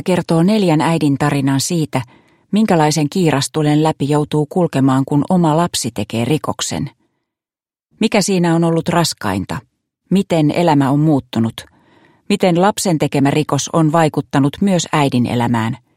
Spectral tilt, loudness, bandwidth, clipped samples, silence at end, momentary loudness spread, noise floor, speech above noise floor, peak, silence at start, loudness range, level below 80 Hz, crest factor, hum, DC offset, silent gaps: -5.5 dB/octave; -15 LUFS; 16 kHz; under 0.1%; 0.2 s; 7 LU; under -90 dBFS; over 75 dB; 0 dBFS; 0.05 s; 3 LU; -52 dBFS; 16 dB; none; under 0.1%; none